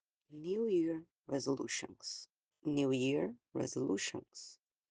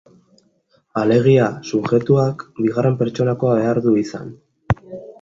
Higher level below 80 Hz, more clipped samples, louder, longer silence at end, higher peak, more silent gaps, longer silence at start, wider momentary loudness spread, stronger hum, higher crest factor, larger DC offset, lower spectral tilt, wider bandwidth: second, -80 dBFS vs -46 dBFS; neither; second, -38 LUFS vs -18 LUFS; first, 0.35 s vs 0.1 s; second, -22 dBFS vs -2 dBFS; first, 1.12-1.16 s, 2.38-2.43 s vs none; second, 0.3 s vs 0.95 s; first, 16 LU vs 13 LU; neither; about the same, 16 dB vs 16 dB; neither; second, -4.5 dB/octave vs -8 dB/octave; first, 10 kHz vs 7.6 kHz